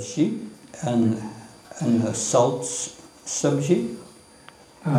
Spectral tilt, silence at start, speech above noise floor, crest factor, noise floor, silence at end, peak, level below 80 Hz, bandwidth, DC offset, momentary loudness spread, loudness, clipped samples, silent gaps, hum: -5.5 dB/octave; 0 s; 26 dB; 18 dB; -49 dBFS; 0 s; -6 dBFS; -66 dBFS; 14 kHz; under 0.1%; 18 LU; -24 LUFS; under 0.1%; none; none